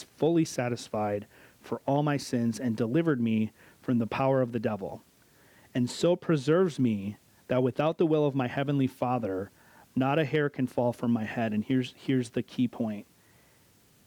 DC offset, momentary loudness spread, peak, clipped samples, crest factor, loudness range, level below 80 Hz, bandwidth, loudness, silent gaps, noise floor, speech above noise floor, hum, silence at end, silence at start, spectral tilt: under 0.1%; 10 LU; -14 dBFS; under 0.1%; 14 dB; 2 LU; -68 dBFS; 19 kHz; -29 LUFS; none; -62 dBFS; 34 dB; none; 1.05 s; 0 s; -7 dB/octave